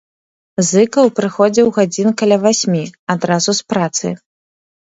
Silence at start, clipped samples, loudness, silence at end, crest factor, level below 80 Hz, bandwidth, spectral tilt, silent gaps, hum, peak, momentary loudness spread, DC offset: 0.6 s; under 0.1%; -14 LUFS; 0.7 s; 14 dB; -60 dBFS; 8 kHz; -4.5 dB/octave; 2.99-3.07 s; none; 0 dBFS; 8 LU; under 0.1%